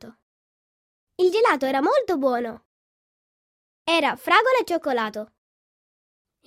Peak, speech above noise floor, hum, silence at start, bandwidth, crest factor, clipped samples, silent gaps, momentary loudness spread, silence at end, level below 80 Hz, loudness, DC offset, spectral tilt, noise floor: -4 dBFS; over 69 dB; none; 0.05 s; 16 kHz; 22 dB; under 0.1%; 0.22-1.07 s, 2.65-3.85 s; 13 LU; 1.2 s; -70 dBFS; -21 LUFS; under 0.1%; -3.5 dB/octave; under -90 dBFS